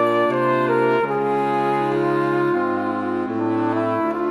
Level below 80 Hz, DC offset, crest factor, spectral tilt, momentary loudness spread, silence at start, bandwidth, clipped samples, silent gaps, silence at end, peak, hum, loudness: -66 dBFS; under 0.1%; 14 dB; -7.5 dB/octave; 5 LU; 0 s; 10.5 kHz; under 0.1%; none; 0 s; -6 dBFS; none; -20 LUFS